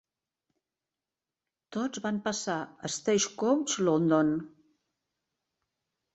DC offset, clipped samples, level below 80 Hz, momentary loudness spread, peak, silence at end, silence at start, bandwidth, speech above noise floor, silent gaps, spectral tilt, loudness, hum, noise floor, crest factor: under 0.1%; under 0.1%; -72 dBFS; 10 LU; -12 dBFS; 1.65 s; 1.7 s; 8.4 kHz; over 61 dB; none; -4 dB/octave; -29 LUFS; none; under -90 dBFS; 20 dB